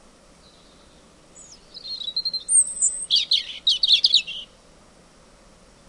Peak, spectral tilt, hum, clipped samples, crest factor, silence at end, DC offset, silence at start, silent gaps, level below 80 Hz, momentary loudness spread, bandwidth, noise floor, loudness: -6 dBFS; 3 dB/octave; none; under 0.1%; 20 dB; 1.45 s; under 0.1%; 1.35 s; none; -58 dBFS; 18 LU; 11.5 kHz; -52 dBFS; -18 LUFS